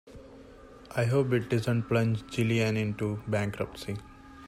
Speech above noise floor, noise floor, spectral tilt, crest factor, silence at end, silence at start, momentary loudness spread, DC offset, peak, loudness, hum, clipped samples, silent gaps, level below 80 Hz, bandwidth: 22 dB; -50 dBFS; -7 dB/octave; 16 dB; 0 s; 0.05 s; 12 LU; under 0.1%; -14 dBFS; -29 LUFS; none; under 0.1%; none; -56 dBFS; 13.5 kHz